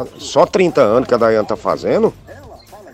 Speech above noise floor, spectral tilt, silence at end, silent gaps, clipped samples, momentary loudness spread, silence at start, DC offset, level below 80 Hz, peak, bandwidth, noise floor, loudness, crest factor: 23 dB; -5.5 dB/octave; 0.05 s; none; under 0.1%; 6 LU; 0 s; under 0.1%; -48 dBFS; 0 dBFS; 14.5 kHz; -38 dBFS; -15 LUFS; 14 dB